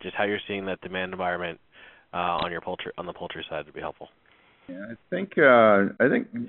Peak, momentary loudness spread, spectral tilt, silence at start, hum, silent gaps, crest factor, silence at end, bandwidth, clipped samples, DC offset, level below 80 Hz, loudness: -4 dBFS; 20 LU; -3.5 dB/octave; 0 s; none; none; 22 dB; 0 s; 4.2 kHz; under 0.1%; under 0.1%; -62 dBFS; -25 LUFS